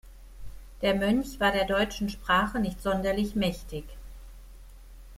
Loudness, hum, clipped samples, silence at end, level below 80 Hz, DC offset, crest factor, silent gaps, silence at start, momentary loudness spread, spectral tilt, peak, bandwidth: -27 LUFS; none; under 0.1%; 0 s; -44 dBFS; under 0.1%; 18 dB; none; 0.05 s; 16 LU; -5 dB/octave; -12 dBFS; 16 kHz